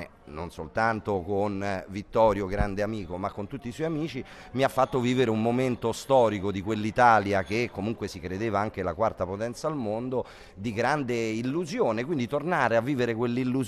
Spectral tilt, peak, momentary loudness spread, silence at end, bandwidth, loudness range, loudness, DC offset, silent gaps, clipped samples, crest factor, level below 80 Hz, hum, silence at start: -6.5 dB/octave; -6 dBFS; 11 LU; 0 s; 14 kHz; 5 LU; -27 LUFS; under 0.1%; none; under 0.1%; 22 dB; -48 dBFS; none; 0 s